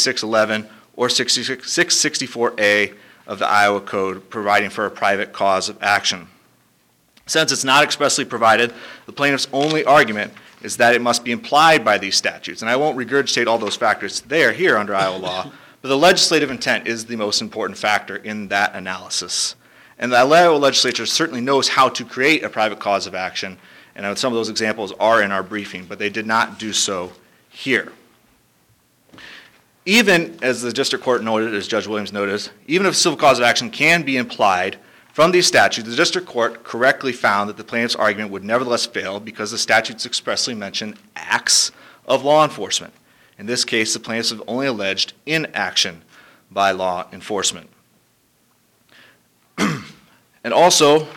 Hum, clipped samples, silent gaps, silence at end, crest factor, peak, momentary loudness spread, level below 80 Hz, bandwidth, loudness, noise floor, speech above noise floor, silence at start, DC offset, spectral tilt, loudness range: none; under 0.1%; none; 0 s; 16 dB; -4 dBFS; 12 LU; -64 dBFS; 19.5 kHz; -18 LUFS; -60 dBFS; 42 dB; 0 s; under 0.1%; -2.5 dB/octave; 6 LU